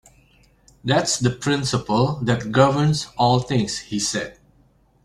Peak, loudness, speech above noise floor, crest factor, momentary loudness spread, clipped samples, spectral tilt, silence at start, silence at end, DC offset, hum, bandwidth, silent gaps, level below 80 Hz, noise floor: -2 dBFS; -20 LUFS; 38 dB; 18 dB; 7 LU; under 0.1%; -5 dB/octave; 0.85 s; 0.7 s; under 0.1%; none; 13 kHz; none; -50 dBFS; -58 dBFS